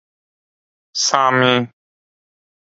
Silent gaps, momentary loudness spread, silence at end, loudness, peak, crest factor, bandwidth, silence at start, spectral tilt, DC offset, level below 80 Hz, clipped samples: none; 14 LU; 1.05 s; -15 LUFS; 0 dBFS; 20 dB; 7.8 kHz; 0.95 s; -3 dB/octave; under 0.1%; -68 dBFS; under 0.1%